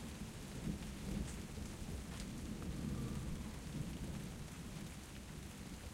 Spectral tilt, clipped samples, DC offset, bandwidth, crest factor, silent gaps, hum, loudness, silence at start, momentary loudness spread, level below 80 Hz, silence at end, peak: -5.5 dB/octave; under 0.1%; under 0.1%; 16 kHz; 16 dB; none; none; -47 LUFS; 0 s; 6 LU; -52 dBFS; 0 s; -30 dBFS